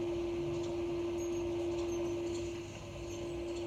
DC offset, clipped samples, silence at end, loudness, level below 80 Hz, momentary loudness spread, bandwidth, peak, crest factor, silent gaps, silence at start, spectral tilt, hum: under 0.1%; under 0.1%; 0 s; -38 LUFS; -54 dBFS; 7 LU; 13 kHz; -28 dBFS; 10 dB; none; 0 s; -6 dB/octave; none